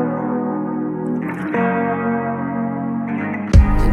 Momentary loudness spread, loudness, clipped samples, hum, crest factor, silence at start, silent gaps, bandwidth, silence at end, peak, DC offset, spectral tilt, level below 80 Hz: 8 LU; -20 LUFS; under 0.1%; none; 18 dB; 0 s; none; 9.6 kHz; 0 s; 0 dBFS; under 0.1%; -8.5 dB/octave; -22 dBFS